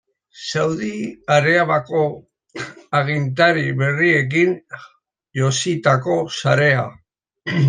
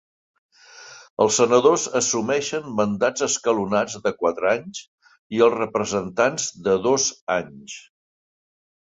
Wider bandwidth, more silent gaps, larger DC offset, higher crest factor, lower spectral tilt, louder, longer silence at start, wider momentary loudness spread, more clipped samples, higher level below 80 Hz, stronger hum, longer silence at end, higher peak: first, 9.8 kHz vs 8.2 kHz; second, none vs 1.10-1.17 s, 4.88-4.98 s, 5.19-5.30 s, 7.21-7.27 s; neither; about the same, 18 dB vs 20 dB; first, -5.5 dB/octave vs -3 dB/octave; first, -18 LUFS vs -21 LUFS; second, 0.35 s vs 0.75 s; about the same, 17 LU vs 19 LU; neither; about the same, -62 dBFS vs -60 dBFS; neither; second, 0 s vs 1.05 s; about the same, -2 dBFS vs -4 dBFS